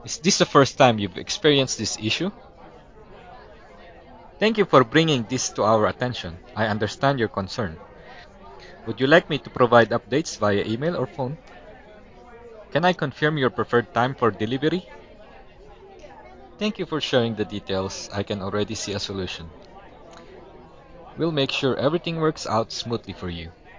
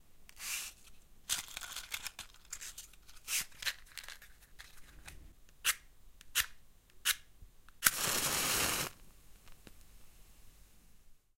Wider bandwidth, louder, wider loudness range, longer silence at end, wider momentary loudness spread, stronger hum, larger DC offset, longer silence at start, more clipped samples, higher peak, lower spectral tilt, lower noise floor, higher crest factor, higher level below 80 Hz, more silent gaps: second, 7.6 kHz vs 17 kHz; first, -23 LUFS vs -36 LUFS; about the same, 7 LU vs 9 LU; second, 0 s vs 0.2 s; second, 14 LU vs 24 LU; neither; neither; about the same, 0 s vs 0 s; neither; first, 0 dBFS vs -4 dBFS; first, -4.5 dB/octave vs 0 dB/octave; second, -46 dBFS vs -59 dBFS; second, 24 dB vs 36 dB; first, -50 dBFS vs -60 dBFS; neither